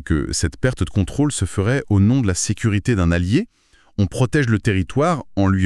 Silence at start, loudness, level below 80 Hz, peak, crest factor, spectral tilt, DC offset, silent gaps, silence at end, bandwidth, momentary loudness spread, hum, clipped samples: 0 s; -19 LUFS; -34 dBFS; -2 dBFS; 16 dB; -6 dB/octave; under 0.1%; none; 0 s; 12 kHz; 5 LU; none; under 0.1%